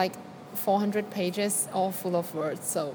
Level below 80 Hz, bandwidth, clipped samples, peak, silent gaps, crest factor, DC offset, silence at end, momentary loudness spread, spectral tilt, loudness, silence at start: -78 dBFS; 19 kHz; under 0.1%; -10 dBFS; none; 18 dB; under 0.1%; 0 s; 6 LU; -4 dB/octave; -29 LUFS; 0 s